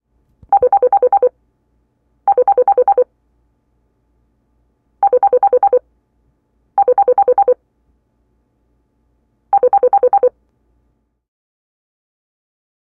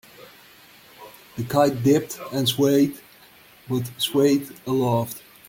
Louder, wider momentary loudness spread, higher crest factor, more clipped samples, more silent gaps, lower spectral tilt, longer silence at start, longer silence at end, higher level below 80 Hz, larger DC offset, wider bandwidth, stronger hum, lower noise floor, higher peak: first, -14 LUFS vs -22 LUFS; second, 6 LU vs 12 LU; about the same, 14 dB vs 18 dB; neither; neither; first, -8 dB/octave vs -5.5 dB/octave; first, 0.5 s vs 0.2 s; first, 2.7 s vs 0.3 s; about the same, -60 dBFS vs -62 dBFS; neither; second, 2.7 kHz vs 17 kHz; neither; first, -63 dBFS vs -51 dBFS; about the same, -4 dBFS vs -4 dBFS